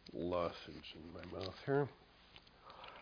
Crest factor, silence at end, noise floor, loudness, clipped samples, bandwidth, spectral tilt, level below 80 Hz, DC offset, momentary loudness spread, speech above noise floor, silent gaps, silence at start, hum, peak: 20 dB; 0 s; -63 dBFS; -42 LUFS; under 0.1%; 5.2 kHz; -5 dB/octave; -68 dBFS; under 0.1%; 22 LU; 21 dB; none; 0 s; none; -24 dBFS